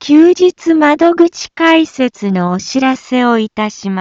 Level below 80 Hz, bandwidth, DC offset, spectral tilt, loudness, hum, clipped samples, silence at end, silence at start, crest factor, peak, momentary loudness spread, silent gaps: -56 dBFS; 7.8 kHz; under 0.1%; -5.5 dB/octave; -11 LUFS; none; under 0.1%; 0 s; 0 s; 10 dB; 0 dBFS; 7 LU; none